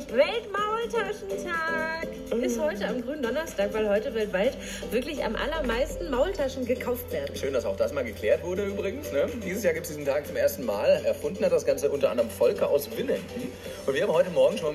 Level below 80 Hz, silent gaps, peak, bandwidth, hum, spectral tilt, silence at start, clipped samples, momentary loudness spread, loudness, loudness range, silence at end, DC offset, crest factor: -48 dBFS; none; -10 dBFS; 15.5 kHz; none; -4.5 dB/octave; 0 s; under 0.1%; 7 LU; -28 LUFS; 3 LU; 0 s; under 0.1%; 18 dB